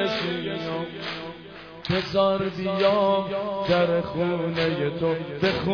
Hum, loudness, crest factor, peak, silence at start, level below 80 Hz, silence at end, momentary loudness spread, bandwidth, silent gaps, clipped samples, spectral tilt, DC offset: none; -25 LUFS; 16 dB; -8 dBFS; 0 s; -54 dBFS; 0 s; 11 LU; 5.4 kHz; none; under 0.1%; -7 dB/octave; under 0.1%